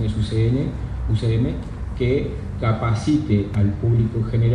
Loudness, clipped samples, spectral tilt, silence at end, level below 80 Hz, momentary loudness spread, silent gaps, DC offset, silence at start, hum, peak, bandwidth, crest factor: -22 LUFS; under 0.1%; -8.5 dB/octave; 0 s; -32 dBFS; 7 LU; none; under 0.1%; 0 s; none; -6 dBFS; 9.8 kHz; 12 dB